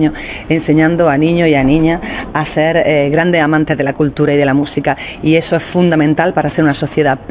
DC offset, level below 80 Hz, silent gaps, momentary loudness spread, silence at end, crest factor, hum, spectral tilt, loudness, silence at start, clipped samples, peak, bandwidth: under 0.1%; -36 dBFS; none; 6 LU; 0 s; 12 dB; none; -11 dB/octave; -12 LUFS; 0 s; under 0.1%; 0 dBFS; 4 kHz